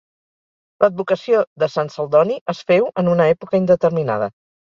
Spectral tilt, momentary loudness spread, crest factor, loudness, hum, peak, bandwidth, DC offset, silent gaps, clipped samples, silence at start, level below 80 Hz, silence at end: -7.5 dB/octave; 6 LU; 16 dB; -18 LUFS; none; -2 dBFS; 7.2 kHz; under 0.1%; 1.47-1.56 s, 2.41-2.46 s; under 0.1%; 0.8 s; -60 dBFS; 0.4 s